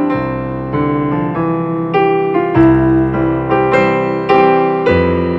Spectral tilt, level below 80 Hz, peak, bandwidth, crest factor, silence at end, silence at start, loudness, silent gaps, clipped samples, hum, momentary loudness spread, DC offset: -9 dB/octave; -34 dBFS; 0 dBFS; 7.4 kHz; 12 dB; 0 s; 0 s; -13 LUFS; none; under 0.1%; none; 7 LU; under 0.1%